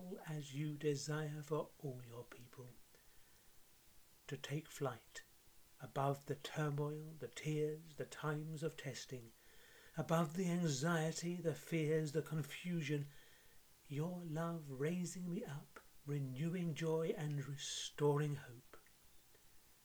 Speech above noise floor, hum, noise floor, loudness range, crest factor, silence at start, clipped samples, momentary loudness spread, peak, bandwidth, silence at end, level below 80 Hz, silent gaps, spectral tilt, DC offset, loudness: 23 dB; none; -65 dBFS; 10 LU; 22 dB; 0 s; under 0.1%; 18 LU; -22 dBFS; over 20 kHz; 0.1 s; -76 dBFS; none; -5.5 dB/octave; under 0.1%; -43 LUFS